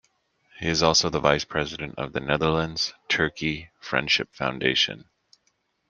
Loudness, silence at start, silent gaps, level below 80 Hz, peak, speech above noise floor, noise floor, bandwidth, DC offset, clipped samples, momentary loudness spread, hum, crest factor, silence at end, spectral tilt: -24 LUFS; 0.55 s; none; -50 dBFS; -2 dBFS; 46 dB; -71 dBFS; 10 kHz; under 0.1%; under 0.1%; 11 LU; none; 24 dB; 0.9 s; -3.5 dB/octave